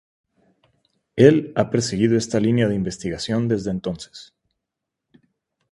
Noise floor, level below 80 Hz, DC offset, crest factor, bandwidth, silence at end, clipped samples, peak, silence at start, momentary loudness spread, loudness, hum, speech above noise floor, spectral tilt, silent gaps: -83 dBFS; -52 dBFS; under 0.1%; 22 dB; 11.5 kHz; 1.45 s; under 0.1%; 0 dBFS; 1.15 s; 15 LU; -20 LUFS; none; 63 dB; -6 dB/octave; none